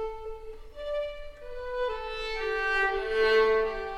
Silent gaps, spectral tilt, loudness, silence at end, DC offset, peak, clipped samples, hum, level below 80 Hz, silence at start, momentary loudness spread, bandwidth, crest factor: none; -3.5 dB/octave; -28 LUFS; 0 s; under 0.1%; -14 dBFS; under 0.1%; none; -44 dBFS; 0 s; 19 LU; 10.5 kHz; 16 dB